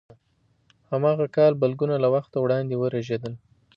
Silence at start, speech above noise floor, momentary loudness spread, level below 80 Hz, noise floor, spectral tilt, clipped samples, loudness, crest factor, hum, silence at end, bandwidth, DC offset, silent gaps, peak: 0.9 s; 44 dB; 11 LU; -66 dBFS; -66 dBFS; -9 dB/octave; under 0.1%; -23 LUFS; 16 dB; none; 0.4 s; 7 kHz; under 0.1%; none; -8 dBFS